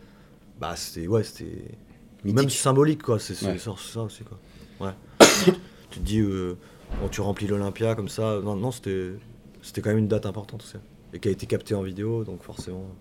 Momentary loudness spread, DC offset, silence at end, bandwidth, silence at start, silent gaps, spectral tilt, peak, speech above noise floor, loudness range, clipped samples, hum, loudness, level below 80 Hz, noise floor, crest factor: 19 LU; under 0.1%; 0 s; 17.5 kHz; 0.6 s; none; -4.5 dB/octave; 0 dBFS; 25 dB; 7 LU; under 0.1%; none; -25 LUFS; -44 dBFS; -51 dBFS; 26 dB